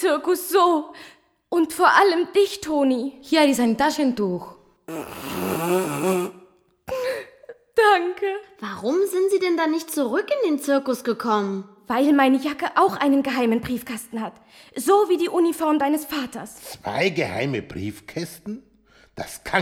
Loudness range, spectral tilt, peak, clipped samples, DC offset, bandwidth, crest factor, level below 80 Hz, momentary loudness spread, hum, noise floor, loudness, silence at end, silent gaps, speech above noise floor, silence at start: 6 LU; -4.5 dB/octave; -2 dBFS; under 0.1%; under 0.1%; 18.5 kHz; 20 dB; -58 dBFS; 15 LU; none; -56 dBFS; -22 LUFS; 0 s; none; 34 dB; 0 s